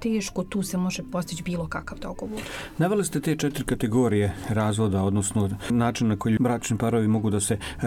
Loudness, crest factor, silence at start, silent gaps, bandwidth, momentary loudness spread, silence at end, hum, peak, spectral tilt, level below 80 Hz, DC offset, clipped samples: -25 LUFS; 14 dB; 0 s; none; 17 kHz; 10 LU; 0 s; none; -12 dBFS; -5.5 dB/octave; -46 dBFS; under 0.1%; under 0.1%